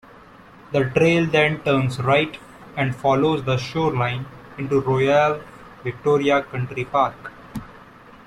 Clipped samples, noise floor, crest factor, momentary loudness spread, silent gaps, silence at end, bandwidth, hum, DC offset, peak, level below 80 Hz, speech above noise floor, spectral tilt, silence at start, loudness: under 0.1%; -46 dBFS; 18 dB; 16 LU; none; 0.5 s; 13 kHz; none; under 0.1%; -4 dBFS; -52 dBFS; 26 dB; -6.5 dB/octave; 0.7 s; -20 LUFS